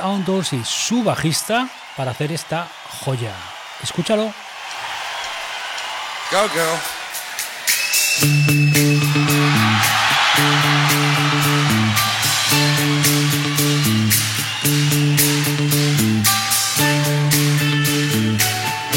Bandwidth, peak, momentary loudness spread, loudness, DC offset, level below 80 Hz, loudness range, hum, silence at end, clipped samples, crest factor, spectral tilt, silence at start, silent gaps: over 20 kHz; -4 dBFS; 11 LU; -17 LUFS; under 0.1%; -54 dBFS; 10 LU; none; 0 s; under 0.1%; 14 dB; -3.5 dB/octave; 0 s; none